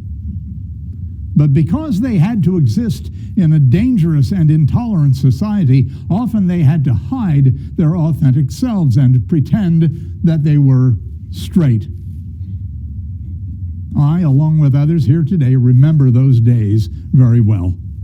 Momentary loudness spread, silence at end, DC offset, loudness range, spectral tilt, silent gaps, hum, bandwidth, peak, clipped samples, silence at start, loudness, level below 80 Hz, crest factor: 16 LU; 0 s; under 0.1%; 5 LU; -9.5 dB/octave; none; none; 7.8 kHz; 0 dBFS; under 0.1%; 0 s; -13 LUFS; -32 dBFS; 12 dB